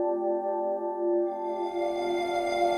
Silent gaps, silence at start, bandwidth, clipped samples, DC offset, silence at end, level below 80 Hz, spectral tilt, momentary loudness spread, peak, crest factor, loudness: none; 0 s; 12 kHz; under 0.1%; under 0.1%; 0 s; -66 dBFS; -4.5 dB/octave; 3 LU; -16 dBFS; 14 dB; -29 LUFS